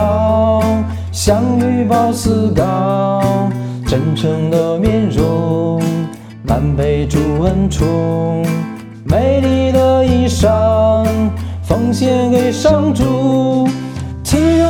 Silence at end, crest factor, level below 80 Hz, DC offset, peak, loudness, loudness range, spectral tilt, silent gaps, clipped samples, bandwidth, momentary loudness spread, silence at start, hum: 0 s; 14 dB; -30 dBFS; 0.2%; 0 dBFS; -14 LUFS; 3 LU; -7 dB/octave; none; under 0.1%; 18.5 kHz; 7 LU; 0 s; none